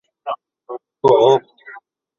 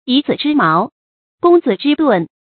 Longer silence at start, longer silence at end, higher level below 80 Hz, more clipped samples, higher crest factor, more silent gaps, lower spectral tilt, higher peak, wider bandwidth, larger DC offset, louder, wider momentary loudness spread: first, 0.25 s vs 0.05 s; first, 0.45 s vs 0.3 s; about the same, -60 dBFS vs -62 dBFS; neither; about the same, 18 dB vs 14 dB; second, none vs 0.92-1.38 s; second, -6 dB/octave vs -11 dB/octave; about the same, -2 dBFS vs 0 dBFS; first, 7.2 kHz vs 4.6 kHz; neither; about the same, -15 LUFS vs -14 LUFS; first, 22 LU vs 5 LU